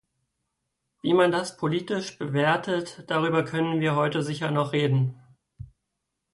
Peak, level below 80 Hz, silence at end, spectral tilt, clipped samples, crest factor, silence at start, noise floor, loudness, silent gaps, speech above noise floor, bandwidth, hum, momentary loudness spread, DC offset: -10 dBFS; -64 dBFS; 0.7 s; -6.5 dB/octave; under 0.1%; 16 dB; 1.05 s; -81 dBFS; -25 LUFS; none; 57 dB; 11.5 kHz; none; 8 LU; under 0.1%